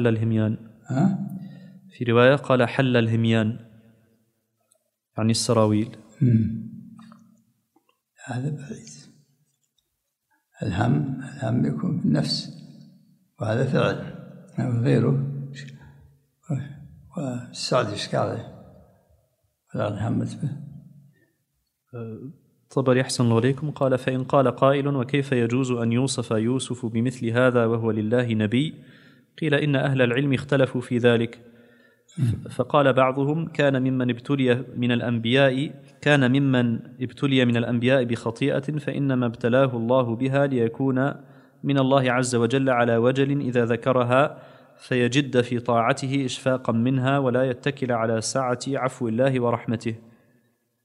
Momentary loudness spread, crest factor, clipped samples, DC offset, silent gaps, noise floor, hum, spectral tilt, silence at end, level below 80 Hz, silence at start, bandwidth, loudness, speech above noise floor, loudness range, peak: 13 LU; 22 dB; under 0.1%; under 0.1%; none; -78 dBFS; none; -6.5 dB/octave; 0.85 s; -62 dBFS; 0 s; 12 kHz; -23 LUFS; 56 dB; 8 LU; -2 dBFS